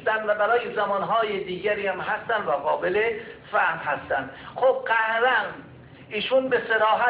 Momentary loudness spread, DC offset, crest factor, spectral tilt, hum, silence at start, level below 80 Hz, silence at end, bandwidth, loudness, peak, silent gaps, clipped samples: 8 LU; under 0.1%; 14 dB; -7.5 dB/octave; none; 0 s; -60 dBFS; 0 s; 4 kHz; -24 LUFS; -10 dBFS; none; under 0.1%